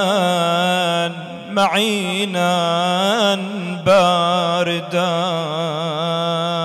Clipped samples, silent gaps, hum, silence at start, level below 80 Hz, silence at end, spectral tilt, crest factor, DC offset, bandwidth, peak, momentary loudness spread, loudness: under 0.1%; none; none; 0 s; -62 dBFS; 0 s; -4.5 dB/octave; 12 dB; under 0.1%; 14 kHz; -6 dBFS; 6 LU; -18 LUFS